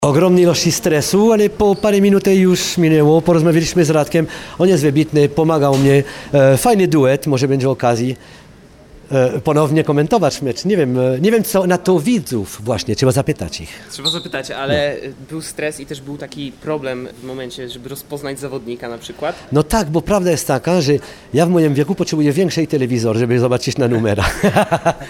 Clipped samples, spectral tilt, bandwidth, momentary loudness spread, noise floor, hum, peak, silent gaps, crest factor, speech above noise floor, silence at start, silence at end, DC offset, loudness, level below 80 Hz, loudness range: under 0.1%; -5.5 dB/octave; 17.5 kHz; 15 LU; -42 dBFS; none; 0 dBFS; none; 14 dB; 27 dB; 0 s; 0 s; under 0.1%; -15 LUFS; -40 dBFS; 10 LU